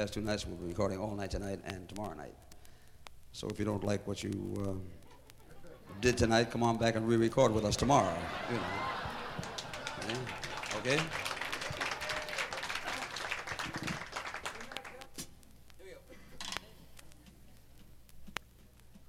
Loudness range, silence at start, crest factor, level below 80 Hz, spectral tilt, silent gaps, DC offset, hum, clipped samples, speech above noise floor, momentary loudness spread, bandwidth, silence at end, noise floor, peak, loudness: 16 LU; 0 s; 24 dB; -54 dBFS; -4.5 dB/octave; none; under 0.1%; none; under 0.1%; 25 dB; 19 LU; 16.5 kHz; 0 s; -58 dBFS; -12 dBFS; -35 LUFS